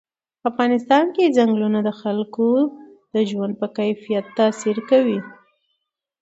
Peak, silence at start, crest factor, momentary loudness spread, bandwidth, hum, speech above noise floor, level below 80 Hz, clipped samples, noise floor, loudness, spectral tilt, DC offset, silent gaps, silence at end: -2 dBFS; 0.45 s; 18 dB; 8 LU; 8 kHz; none; 57 dB; -70 dBFS; under 0.1%; -76 dBFS; -20 LUFS; -6 dB/octave; under 0.1%; none; 0.9 s